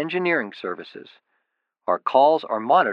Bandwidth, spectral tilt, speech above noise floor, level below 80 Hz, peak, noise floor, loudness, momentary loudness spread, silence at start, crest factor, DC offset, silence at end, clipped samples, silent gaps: 5.8 kHz; -7 dB/octave; 55 dB; -86 dBFS; -4 dBFS; -76 dBFS; -21 LUFS; 16 LU; 0 s; 18 dB; under 0.1%; 0 s; under 0.1%; none